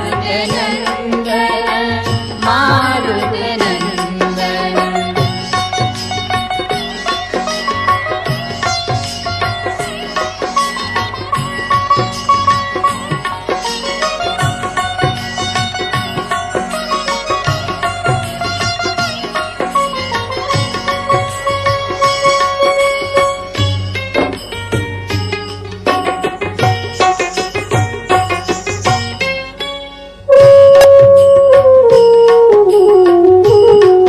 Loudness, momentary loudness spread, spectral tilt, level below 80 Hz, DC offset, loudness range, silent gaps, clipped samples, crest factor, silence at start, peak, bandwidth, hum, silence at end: -13 LUFS; 12 LU; -5 dB/octave; -36 dBFS; under 0.1%; 10 LU; none; 0.2%; 12 dB; 0 s; 0 dBFS; 13.5 kHz; none; 0 s